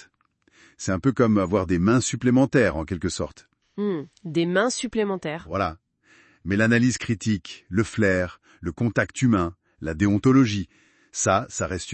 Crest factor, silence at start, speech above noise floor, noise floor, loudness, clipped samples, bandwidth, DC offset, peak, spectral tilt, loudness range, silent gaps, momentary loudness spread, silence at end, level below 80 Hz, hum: 18 dB; 0.8 s; 42 dB; -64 dBFS; -23 LUFS; under 0.1%; 8.8 kHz; under 0.1%; -6 dBFS; -5.5 dB/octave; 4 LU; none; 13 LU; 0 s; -52 dBFS; none